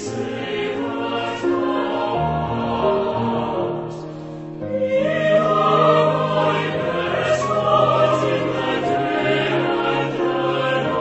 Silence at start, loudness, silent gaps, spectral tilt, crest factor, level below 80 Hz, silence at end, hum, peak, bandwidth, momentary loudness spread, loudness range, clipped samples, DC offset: 0 s; -20 LUFS; none; -6 dB/octave; 16 dB; -48 dBFS; 0 s; none; -4 dBFS; 8.4 kHz; 9 LU; 5 LU; under 0.1%; under 0.1%